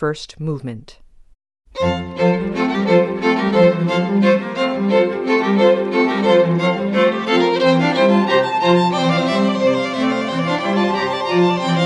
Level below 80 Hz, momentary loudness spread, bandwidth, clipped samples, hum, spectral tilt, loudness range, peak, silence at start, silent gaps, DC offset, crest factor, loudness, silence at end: -52 dBFS; 6 LU; 10.5 kHz; under 0.1%; none; -6.5 dB/octave; 3 LU; 0 dBFS; 0 s; none; under 0.1%; 16 dB; -16 LUFS; 0 s